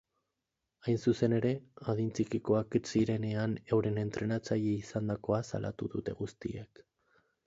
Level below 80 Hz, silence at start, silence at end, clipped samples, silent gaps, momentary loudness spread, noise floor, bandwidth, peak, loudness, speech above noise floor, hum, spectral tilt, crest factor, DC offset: -62 dBFS; 0.85 s; 0.8 s; under 0.1%; none; 10 LU; -87 dBFS; 8 kHz; -16 dBFS; -34 LUFS; 54 dB; none; -7.5 dB/octave; 18 dB; under 0.1%